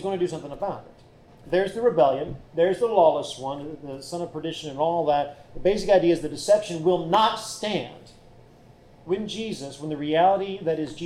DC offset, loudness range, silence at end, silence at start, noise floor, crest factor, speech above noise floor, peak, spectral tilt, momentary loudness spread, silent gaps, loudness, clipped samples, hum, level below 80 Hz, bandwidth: under 0.1%; 5 LU; 0 s; 0 s; -51 dBFS; 16 dB; 27 dB; -8 dBFS; -5 dB/octave; 13 LU; none; -24 LUFS; under 0.1%; none; -52 dBFS; 14 kHz